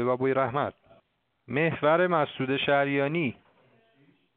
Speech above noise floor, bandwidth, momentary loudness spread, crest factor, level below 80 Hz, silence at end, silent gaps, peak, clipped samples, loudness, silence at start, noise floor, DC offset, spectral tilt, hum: 43 dB; 4.5 kHz; 8 LU; 18 dB; -66 dBFS; 1.05 s; none; -10 dBFS; under 0.1%; -26 LUFS; 0 s; -68 dBFS; under 0.1%; -4 dB/octave; none